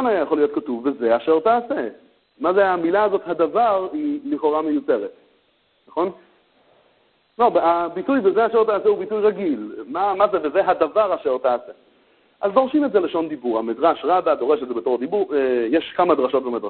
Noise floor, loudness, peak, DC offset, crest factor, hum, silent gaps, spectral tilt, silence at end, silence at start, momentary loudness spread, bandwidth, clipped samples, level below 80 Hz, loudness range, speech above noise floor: -63 dBFS; -20 LUFS; -2 dBFS; under 0.1%; 18 dB; none; none; -10 dB/octave; 0 s; 0 s; 8 LU; 4.5 kHz; under 0.1%; -62 dBFS; 4 LU; 43 dB